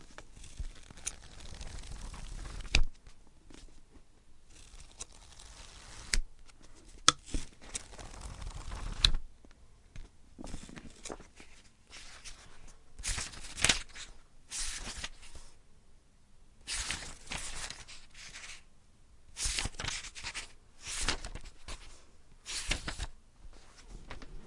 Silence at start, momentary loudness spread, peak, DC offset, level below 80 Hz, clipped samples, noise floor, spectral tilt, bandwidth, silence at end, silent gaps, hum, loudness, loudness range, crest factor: 0 s; 26 LU; -4 dBFS; under 0.1%; -44 dBFS; under 0.1%; -58 dBFS; -1 dB/octave; 11.5 kHz; 0 s; none; none; -37 LUFS; 8 LU; 34 dB